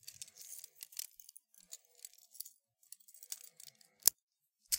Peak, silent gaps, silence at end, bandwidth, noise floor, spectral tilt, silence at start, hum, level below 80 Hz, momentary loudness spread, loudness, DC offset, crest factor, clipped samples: -2 dBFS; 4.22-4.28 s; 0 s; 17 kHz; -63 dBFS; 2.5 dB/octave; 0.05 s; none; -84 dBFS; 25 LU; -39 LUFS; under 0.1%; 42 dB; under 0.1%